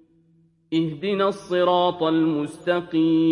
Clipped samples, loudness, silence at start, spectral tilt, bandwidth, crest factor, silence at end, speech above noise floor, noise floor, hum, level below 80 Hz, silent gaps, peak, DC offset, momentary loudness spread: under 0.1%; -22 LUFS; 0.7 s; -7 dB/octave; 11 kHz; 14 dB; 0 s; 39 dB; -60 dBFS; none; -66 dBFS; none; -8 dBFS; under 0.1%; 6 LU